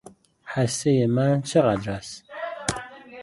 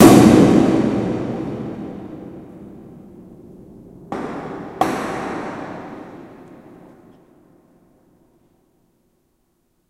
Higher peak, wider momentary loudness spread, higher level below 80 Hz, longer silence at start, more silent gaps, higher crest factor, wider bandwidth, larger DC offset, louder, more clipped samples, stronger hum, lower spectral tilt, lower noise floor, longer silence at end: second, -6 dBFS vs 0 dBFS; second, 14 LU vs 28 LU; second, -54 dBFS vs -46 dBFS; about the same, 0.05 s vs 0 s; neither; about the same, 18 dB vs 20 dB; second, 11.5 kHz vs 16 kHz; neither; second, -24 LUFS vs -17 LUFS; neither; neither; about the same, -5.5 dB/octave vs -6 dB/octave; second, -43 dBFS vs -65 dBFS; second, 0 s vs 3.65 s